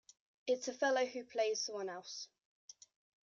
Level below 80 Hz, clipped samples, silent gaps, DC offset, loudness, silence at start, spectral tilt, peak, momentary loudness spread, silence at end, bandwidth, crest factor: -90 dBFS; under 0.1%; 2.45-2.68 s; under 0.1%; -38 LUFS; 0.45 s; -1 dB/octave; -22 dBFS; 21 LU; 0.5 s; 7.6 kHz; 18 dB